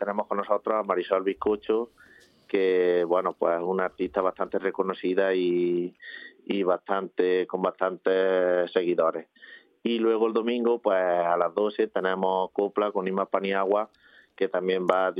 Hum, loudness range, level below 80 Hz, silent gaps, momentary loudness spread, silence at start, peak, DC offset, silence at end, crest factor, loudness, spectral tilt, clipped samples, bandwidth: none; 2 LU; -70 dBFS; none; 6 LU; 0 s; -4 dBFS; under 0.1%; 0 s; 22 dB; -26 LUFS; -8 dB/octave; under 0.1%; 5 kHz